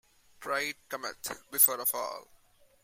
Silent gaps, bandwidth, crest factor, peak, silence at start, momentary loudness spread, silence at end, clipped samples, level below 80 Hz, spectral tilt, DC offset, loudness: none; 16 kHz; 24 dB; -8 dBFS; 0.4 s; 17 LU; 0.6 s; under 0.1%; -74 dBFS; 0 dB/octave; under 0.1%; -29 LUFS